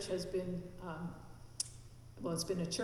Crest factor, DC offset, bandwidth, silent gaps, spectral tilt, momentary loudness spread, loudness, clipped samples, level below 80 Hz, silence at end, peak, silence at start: 22 dB; under 0.1%; 15 kHz; none; -4.5 dB/octave; 17 LU; -41 LUFS; under 0.1%; -58 dBFS; 0 s; -20 dBFS; 0 s